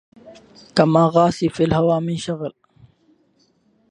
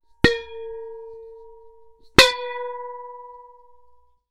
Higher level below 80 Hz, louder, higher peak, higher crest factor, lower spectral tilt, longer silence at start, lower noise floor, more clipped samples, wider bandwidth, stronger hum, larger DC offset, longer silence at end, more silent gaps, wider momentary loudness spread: second, -50 dBFS vs -42 dBFS; about the same, -18 LUFS vs -19 LUFS; about the same, 0 dBFS vs -2 dBFS; about the same, 20 dB vs 24 dB; first, -7 dB/octave vs -3 dB/octave; about the same, 0.25 s vs 0.25 s; first, -61 dBFS vs -57 dBFS; neither; second, 10 kHz vs over 20 kHz; neither; neither; first, 1.4 s vs 0.9 s; neither; second, 12 LU vs 26 LU